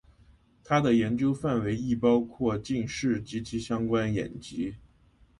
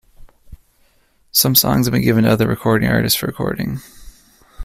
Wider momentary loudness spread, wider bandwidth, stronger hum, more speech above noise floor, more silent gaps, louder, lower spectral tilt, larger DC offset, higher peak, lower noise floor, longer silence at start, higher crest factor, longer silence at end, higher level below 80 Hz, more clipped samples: about the same, 10 LU vs 11 LU; second, 11 kHz vs 16 kHz; neither; second, 33 dB vs 41 dB; neither; second, -28 LUFS vs -16 LUFS; first, -6.5 dB/octave vs -4.5 dB/octave; neither; second, -10 dBFS vs 0 dBFS; first, -61 dBFS vs -57 dBFS; first, 0.7 s vs 0.2 s; about the same, 18 dB vs 18 dB; first, 0.6 s vs 0 s; second, -54 dBFS vs -42 dBFS; neither